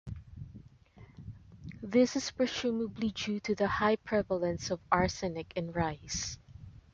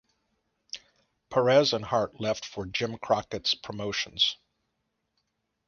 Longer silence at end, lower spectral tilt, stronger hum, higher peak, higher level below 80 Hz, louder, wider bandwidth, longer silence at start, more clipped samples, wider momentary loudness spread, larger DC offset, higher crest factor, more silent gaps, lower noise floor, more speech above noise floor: second, 0.15 s vs 1.35 s; about the same, -4.5 dB/octave vs -4 dB/octave; neither; about the same, -10 dBFS vs -8 dBFS; first, -54 dBFS vs -62 dBFS; second, -32 LUFS vs -27 LUFS; about the same, 7.8 kHz vs 7.2 kHz; second, 0.05 s vs 0.75 s; neither; about the same, 21 LU vs 20 LU; neither; about the same, 24 dB vs 22 dB; neither; second, -57 dBFS vs -79 dBFS; second, 25 dB vs 52 dB